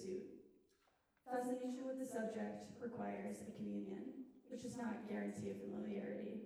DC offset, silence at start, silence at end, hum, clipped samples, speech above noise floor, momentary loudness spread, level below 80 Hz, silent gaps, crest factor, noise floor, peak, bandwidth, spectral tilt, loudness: under 0.1%; 0 s; 0 s; none; under 0.1%; 33 dB; 8 LU; -82 dBFS; none; 16 dB; -79 dBFS; -32 dBFS; 14.5 kHz; -6.5 dB/octave; -47 LUFS